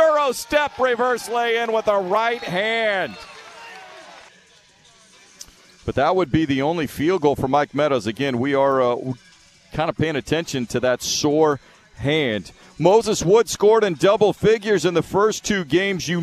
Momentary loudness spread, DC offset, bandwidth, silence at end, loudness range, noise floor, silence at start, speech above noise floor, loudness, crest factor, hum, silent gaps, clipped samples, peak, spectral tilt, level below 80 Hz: 12 LU; under 0.1%; 14 kHz; 0 s; 8 LU; -53 dBFS; 0 s; 33 dB; -20 LUFS; 18 dB; none; none; under 0.1%; -2 dBFS; -4.5 dB/octave; -50 dBFS